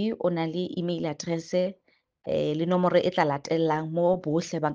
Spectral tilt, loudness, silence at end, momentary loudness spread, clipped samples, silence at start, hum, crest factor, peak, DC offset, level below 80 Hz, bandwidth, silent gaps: -6.5 dB/octave; -27 LUFS; 0 s; 8 LU; under 0.1%; 0 s; none; 18 dB; -8 dBFS; under 0.1%; -66 dBFS; 7.6 kHz; none